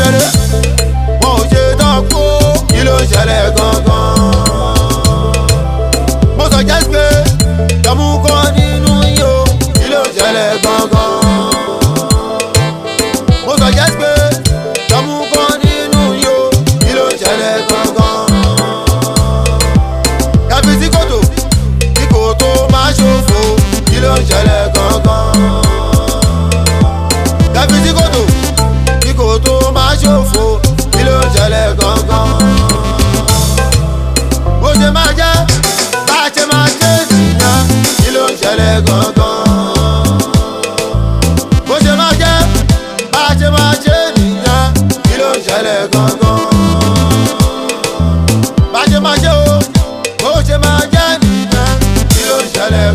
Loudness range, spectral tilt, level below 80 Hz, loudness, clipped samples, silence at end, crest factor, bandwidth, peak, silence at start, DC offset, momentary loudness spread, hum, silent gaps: 2 LU; -4.5 dB/octave; -16 dBFS; -10 LUFS; 0.4%; 0 s; 10 dB; 16 kHz; 0 dBFS; 0 s; under 0.1%; 4 LU; none; none